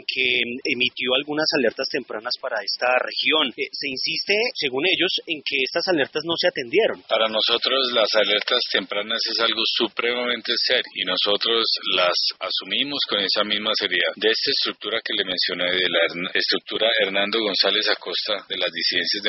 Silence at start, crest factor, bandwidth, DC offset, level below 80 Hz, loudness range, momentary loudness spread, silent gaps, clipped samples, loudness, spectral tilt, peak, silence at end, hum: 0.1 s; 20 dB; 6 kHz; under 0.1%; -68 dBFS; 2 LU; 5 LU; none; under 0.1%; -21 LUFS; 0.5 dB/octave; -2 dBFS; 0 s; none